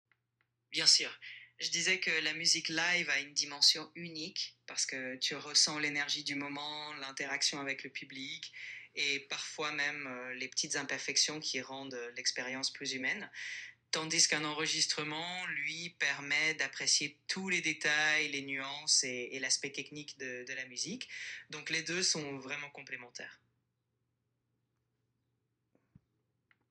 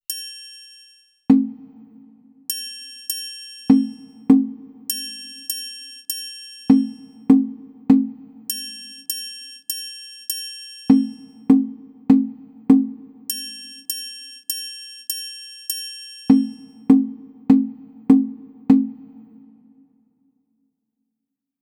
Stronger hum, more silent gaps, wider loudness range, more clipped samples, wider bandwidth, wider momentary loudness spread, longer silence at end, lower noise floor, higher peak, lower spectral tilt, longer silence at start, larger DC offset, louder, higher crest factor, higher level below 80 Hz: neither; neither; about the same, 7 LU vs 5 LU; neither; second, 13 kHz vs 18.5 kHz; about the same, 15 LU vs 17 LU; first, 3.35 s vs 2.4 s; about the same, -83 dBFS vs -82 dBFS; second, -12 dBFS vs 0 dBFS; second, -0.5 dB/octave vs -4.5 dB/octave; first, 0.7 s vs 0.1 s; neither; second, -33 LUFS vs -21 LUFS; about the same, 26 dB vs 22 dB; second, -86 dBFS vs -60 dBFS